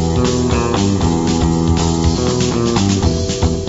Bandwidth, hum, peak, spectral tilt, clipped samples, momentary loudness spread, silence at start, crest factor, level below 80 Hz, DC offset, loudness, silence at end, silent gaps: 8 kHz; none; 0 dBFS; -5.5 dB/octave; under 0.1%; 1 LU; 0 s; 14 dB; -24 dBFS; 0.3%; -15 LUFS; 0 s; none